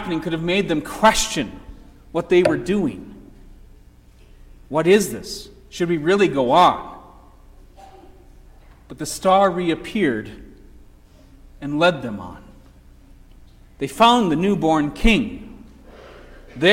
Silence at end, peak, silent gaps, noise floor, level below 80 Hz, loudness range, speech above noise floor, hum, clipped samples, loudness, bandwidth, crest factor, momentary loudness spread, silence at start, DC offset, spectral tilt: 0 s; -2 dBFS; none; -48 dBFS; -38 dBFS; 5 LU; 29 dB; none; under 0.1%; -19 LUFS; 16.5 kHz; 18 dB; 19 LU; 0 s; under 0.1%; -4.5 dB/octave